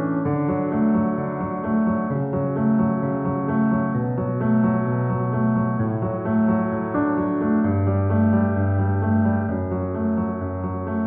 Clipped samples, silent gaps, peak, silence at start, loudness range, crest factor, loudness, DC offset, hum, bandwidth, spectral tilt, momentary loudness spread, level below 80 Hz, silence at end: under 0.1%; none; -8 dBFS; 0 s; 1 LU; 12 dB; -22 LUFS; under 0.1%; none; 2.9 kHz; -11 dB/octave; 5 LU; -50 dBFS; 0 s